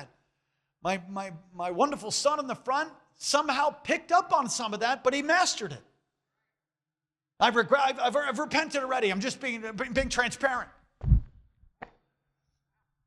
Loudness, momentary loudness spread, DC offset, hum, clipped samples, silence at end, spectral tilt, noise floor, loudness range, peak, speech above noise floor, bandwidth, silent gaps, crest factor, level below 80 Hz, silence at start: -28 LUFS; 11 LU; under 0.1%; none; under 0.1%; 1.2 s; -3.5 dB/octave; under -90 dBFS; 4 LU; -10 dBFS; over 62 dB; 13 kHz; none; 20 dB; -42 dBFS; 0 s